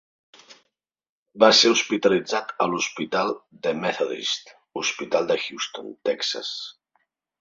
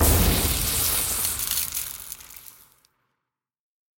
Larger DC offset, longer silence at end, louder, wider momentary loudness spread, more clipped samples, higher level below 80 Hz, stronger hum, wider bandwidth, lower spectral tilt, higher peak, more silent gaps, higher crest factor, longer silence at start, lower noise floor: neither; second, 0.7 s vs 1.45 s; about the same, -23 LUFS vs -22 LUFS; second, 15 LU vs 18 LU; neither; second, -68 dBFS vs -32 dBFS; neither; second, 7.8 kHz vs 17.5 kHz; about the same, -2.5 dB/octave vs -3 dB/octave; first, -2 dBFS vs -8 dBFS; first, 1.09-1.26 s vs none; about the same, 22 dB vs 18 dB; first, 0.5 s vs 0 s; second, -79 dBFS vs -84 dBFS